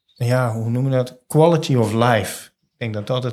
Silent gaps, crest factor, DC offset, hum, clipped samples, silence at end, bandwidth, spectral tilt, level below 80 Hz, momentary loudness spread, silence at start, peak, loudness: none; 18 dB; under 0.1%; none; under 0.1%; 0 s; 14.5 kHz; -6.5 dB/octave; -62 dBFS; 13 LU; 0.2 s; -2 dBFS; -19 LUFS